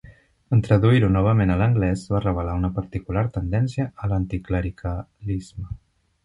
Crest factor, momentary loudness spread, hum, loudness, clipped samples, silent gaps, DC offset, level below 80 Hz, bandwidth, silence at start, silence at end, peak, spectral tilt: 18 dB; 13 LU; none; -23 LUFS; under 0.1%; none; under 0.1%; -36 dBFS; 10.5 kHz; 0.05 s; 0.5 s; -4 dBFS; -8.5 dB/octave